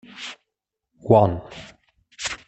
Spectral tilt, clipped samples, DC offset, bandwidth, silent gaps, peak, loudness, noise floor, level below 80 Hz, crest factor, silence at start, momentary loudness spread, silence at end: -6 dB/octave; under 0.1%; under 0.1%; 8.6 kHz; none; -2 dBFS; -20 LUFS; -83 dBFS; -52 dBFS; 22 dB; 0.2 s; 23 LU; 0.1 s